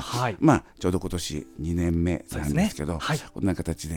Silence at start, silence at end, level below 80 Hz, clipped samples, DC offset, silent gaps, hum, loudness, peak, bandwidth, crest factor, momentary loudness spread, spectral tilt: 0 s; 0 s; -40 dBFS; under 0.1%; under 0.1%; none; none; -26 LUFS; -4 dBFS; 18 kHz; 22 dB; 9 LU; -6 dB/octave